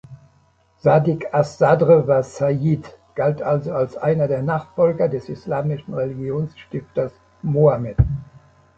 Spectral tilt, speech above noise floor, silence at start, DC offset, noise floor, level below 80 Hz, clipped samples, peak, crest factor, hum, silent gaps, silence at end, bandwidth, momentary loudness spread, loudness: -9 dB/octave; 39 dB; 0.1 s; under 0.1%; -58 dBFS; -38 dBFS; under 0.1%; -2 dBFS; 18 dB; none; none; 0.4 s; 7.8 kHz; 11 LU; -20 LUFS